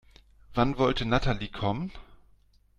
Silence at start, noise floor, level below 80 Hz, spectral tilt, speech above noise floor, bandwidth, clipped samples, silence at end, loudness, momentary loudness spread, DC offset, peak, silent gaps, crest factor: 0.5 s; -61 dBFS; -40 dBFS; -7 dB/octave; 34 dB; 9.6 kHz; under 0.1%; 0.65 s; -29 LUFS; 10 LU; under 0.1%; -8 dBFS; none; 20 dB